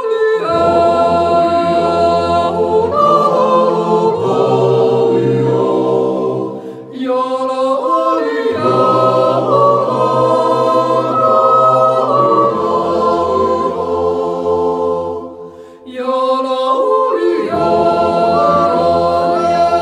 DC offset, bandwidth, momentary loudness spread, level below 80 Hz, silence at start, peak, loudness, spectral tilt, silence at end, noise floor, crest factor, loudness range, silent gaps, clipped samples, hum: under 0.1%; 10.5 kHz; 6 LU; -48 dBFS; 0 s; 0 dBFS; -13 LUFS; -7 dB/octave; 0 s; -33 dBFS; 12 dB; 5 LU; none; under 0.1%; none